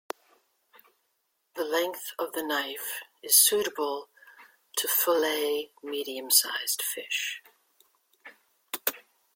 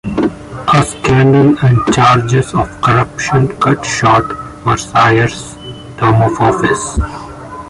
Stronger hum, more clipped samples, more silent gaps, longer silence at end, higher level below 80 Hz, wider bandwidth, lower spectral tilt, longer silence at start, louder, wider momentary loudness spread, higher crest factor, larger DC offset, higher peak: neither; neither; neither; first, 0.35 s vs 0 s; second, -80 dBFS vs -30 dBFS; first, 16.5 kHz vs 11.5 kHz; second, 1 dB/octave vs -6 dB/octave; first, 1.55 s vs 0.05 s; second, -26 LUFS vs -12 LUFS; first, 16 LU vs 13 LU; first, 26 dB vs 12 dB; neither; second, -6 dBFS vs 0 dBFS